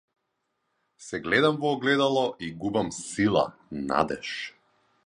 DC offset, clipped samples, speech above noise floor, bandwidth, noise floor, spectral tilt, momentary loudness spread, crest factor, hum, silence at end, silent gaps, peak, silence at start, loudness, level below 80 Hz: under 0.1%; under 0.1%; 52 dB; 11 kHz; -78 dBFS; -4.5 dB/octave; 13 LU; 22 dB; none; 0.55 s; none; -6 dBFS; 1 s; -26 LUFS; -58 dBFS